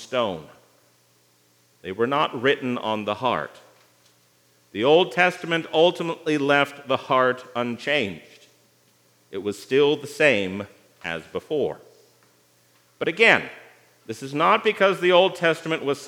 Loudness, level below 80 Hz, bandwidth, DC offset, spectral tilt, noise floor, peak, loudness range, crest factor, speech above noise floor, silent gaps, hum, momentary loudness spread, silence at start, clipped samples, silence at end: -22 LUFS; -74 dBFS; 16.5 kHz; under 0.1%; -4.5 dB/octave; -61 dBFS; 0 dBFS; 5 LU; 22 dB; 39 dB; none; 60 Hz at -60 dBFS; 18 LU; 0 s; under 0.1%; 0 s